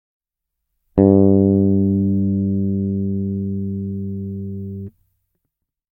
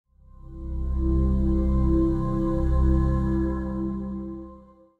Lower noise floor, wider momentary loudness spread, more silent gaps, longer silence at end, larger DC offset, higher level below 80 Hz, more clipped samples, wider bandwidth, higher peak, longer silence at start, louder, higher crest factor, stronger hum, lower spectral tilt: first, -80 dBFS vs -49 dBFS; about the same, 16 LU vs 14 LU; neither; first, 1.1 s vs 0.35 s; neither; second, -48 dBFS vs -26 dBFS; neither; second, 2 kHz vs 4.1 kHz; first, 0 dBFS vs -12 dBFS; first, 0.95 s vs 0.45 s; first, -18 LUFS vs -25 LUFS; first, 18 dB vs 12 dB; neither; first, -15 dB/octave vs -11 dB/octave